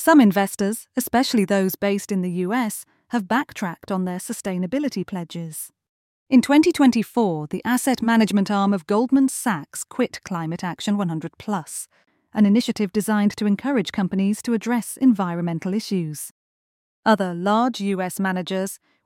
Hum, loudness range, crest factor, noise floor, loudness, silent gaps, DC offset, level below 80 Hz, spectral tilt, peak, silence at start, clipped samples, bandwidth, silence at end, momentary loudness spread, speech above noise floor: none; 6 LU; 18 dB; under -90 dBFS; -22 LUFS; 5.89-6.26 s, 16.31-17.03 s; under 0.1%; -62 dBFS; -5.5 dB/octave; -4 dBFS; 0 s; under 0.1%; 17 kHz; 0.3 s; 12 LU; over 69 dB